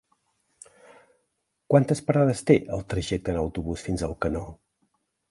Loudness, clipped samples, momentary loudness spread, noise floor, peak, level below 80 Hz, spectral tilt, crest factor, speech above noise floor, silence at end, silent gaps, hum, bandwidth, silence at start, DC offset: -25 LUFS; under 0.1%; 9 LU; -77 dBFS; -4 dBFS; -44 dBFS; -7 dB/octave; 22 dB; 53 dB; 0.75 s; none; none; 11.5 kHz; 1.7 s; under 0.1%